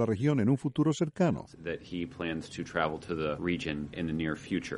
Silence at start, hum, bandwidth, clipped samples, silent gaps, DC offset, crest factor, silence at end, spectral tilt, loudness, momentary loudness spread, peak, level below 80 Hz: 0 s; none; 11.5 kHz; under 0.1%; none; under 0.1%; 18 dB; 0 s; -6.5 dB/octave; -32 LUFS; 9 LU; -12 dBFS; -56 dBFS